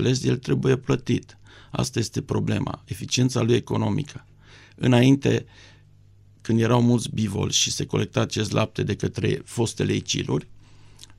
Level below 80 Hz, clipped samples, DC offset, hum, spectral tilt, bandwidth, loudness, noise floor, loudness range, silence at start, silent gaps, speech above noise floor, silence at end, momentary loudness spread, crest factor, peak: -50 dBFS; under 0.1%; under 0.1%; 50 Hz at -50 dBFS; -5 dB/octave; 14.5 kHz; -23 LUFS; -52 dBFS; 3 LU; 0 s; none; 29 dB; 0.05 s; 9 LU; 20 dB; -4 dBFS